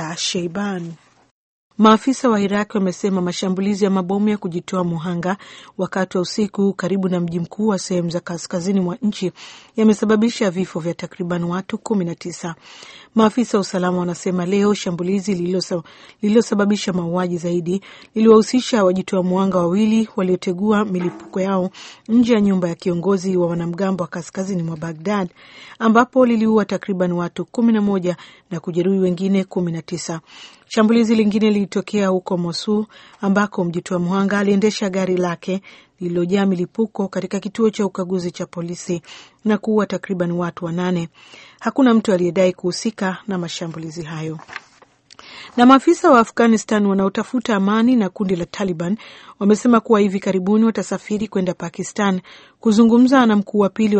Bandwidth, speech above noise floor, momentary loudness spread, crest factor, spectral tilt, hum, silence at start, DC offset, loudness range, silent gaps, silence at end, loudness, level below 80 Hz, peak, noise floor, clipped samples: 8.8 kHz; 32 dB; 12 LU; 18 dB; -6 dB/octave; none; 0 s; under 0.1%; 5 LU; 1.31-1.70 s; 0 s; -19 LUFS; -58 dBFS; 0 dBFS; -50 dBFS; under 0.1%